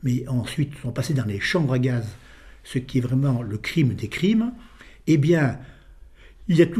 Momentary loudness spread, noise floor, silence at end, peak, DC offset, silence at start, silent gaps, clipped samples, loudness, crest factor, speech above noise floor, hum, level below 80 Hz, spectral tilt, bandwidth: 11 LU; -47 dBFS; 0 s; -4 dBFS; under 0.1%; 0 s; none; under 0.1%; -23 LUFS; 18 dB; 25 dB; none; -48 dBFS; -7 dB/octave; 14 kHz